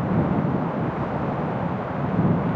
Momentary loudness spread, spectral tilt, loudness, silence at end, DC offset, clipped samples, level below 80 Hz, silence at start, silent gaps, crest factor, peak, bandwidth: 5 LU; -10.5 dB/octave; -24 LUFS; 0 s; under 0.1%; under 0.1%; -46 dBFS; 0 s; none; 14 dB; -10 dBFS; 5.4 kHz